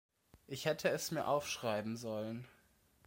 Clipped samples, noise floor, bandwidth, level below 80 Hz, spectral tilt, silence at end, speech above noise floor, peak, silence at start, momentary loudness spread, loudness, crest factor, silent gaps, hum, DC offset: under 0.1%; -71 dBFS; 16.5 kHz; -74 dBFS; -4 dB/octave; 0.55 s; 33 dB; -20 dBFS; 0.35 s; 12 LU; -39 LUFS; 20 dB; none; none; under 0.1%